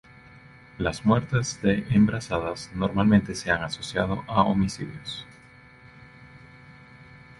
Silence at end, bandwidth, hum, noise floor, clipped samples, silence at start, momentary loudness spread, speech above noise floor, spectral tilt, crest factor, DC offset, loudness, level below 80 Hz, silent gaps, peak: 0.2 s; 11.5 kHz; none; -51 dBFS; under 0.1%; 0.35 s; 13 LU; 27 dB; -6 dB/octave; 22 dB; under 0.1%; -25 LUFS; -48 dBFS; none; -4 dBFS